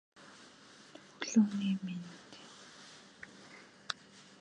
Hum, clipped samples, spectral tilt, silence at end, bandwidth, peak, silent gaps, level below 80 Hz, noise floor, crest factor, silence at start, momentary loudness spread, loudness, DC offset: none; under 0.1%; -5 dB/octave; 0.2 s; 9.8 kHz; -14 dBFS; none; -82 dBFS; -58 dBFS; 26 dB; 0.2 s; 25 LU; -35 LUFS; under 0.1%